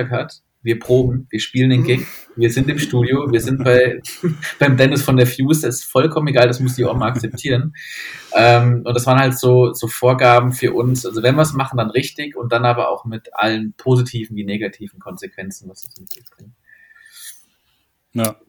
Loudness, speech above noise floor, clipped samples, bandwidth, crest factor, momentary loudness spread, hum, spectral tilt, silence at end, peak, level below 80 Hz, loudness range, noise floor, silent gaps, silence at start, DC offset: -16 LUFS; 48 dB; under 0.1%; 20 kHz; 16 dB; 18 LU; none; -6 dB/octave; 0.15 s; 0 dBFS; -46 dBFS; 10 LU; -64 dBFS; none; 0 s; under 0.1%